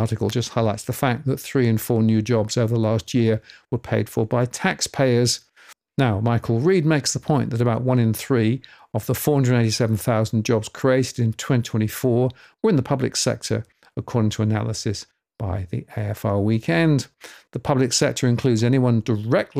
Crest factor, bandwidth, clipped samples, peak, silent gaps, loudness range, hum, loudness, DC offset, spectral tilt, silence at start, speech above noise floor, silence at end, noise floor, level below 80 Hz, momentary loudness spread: 16 dB; 16 kHz; under 0.1%; -6 dBFS; none; 3 LU; none; -21 LUFS; under 0.1%; -5.5 dB/octave; 0 s; 30 dB; 0 s; -51 dBFS; -56 dBFS; 9 LU